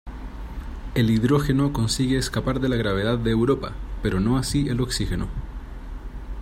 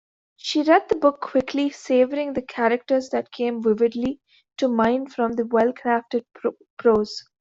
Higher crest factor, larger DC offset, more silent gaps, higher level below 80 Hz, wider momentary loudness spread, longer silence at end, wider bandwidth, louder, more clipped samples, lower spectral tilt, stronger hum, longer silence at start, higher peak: about the same, 16 dB vs 18 dB; neither; second, none vs 6.70-6.77 s; first, -34 dBFS vs -58 dBFS; first, 18 LU vs 10 LU; second, 0 s vs 0.2 s; first, 16 kHz vs 7.8 kHz; about the same, -23 LUFS vs -22 LUFS; neither; about the same, -6 dB/octave vs -5 dB/octave; neither; second, 0.05 s vs 0.45 s; about the same, -6 dBFS vs -4 dBFS